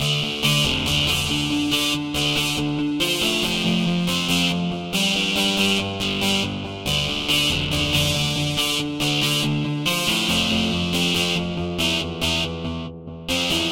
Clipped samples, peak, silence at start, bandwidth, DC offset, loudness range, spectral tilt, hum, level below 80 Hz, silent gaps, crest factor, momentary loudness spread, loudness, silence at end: under 0.1%; -6 dBFS; 0 s; 17 kHz; 0.1%; 1 LU; -3.5 dB/octave; none; -42 dBFS; none; 16 dB; 5 LU; -20 LUFS; 0 s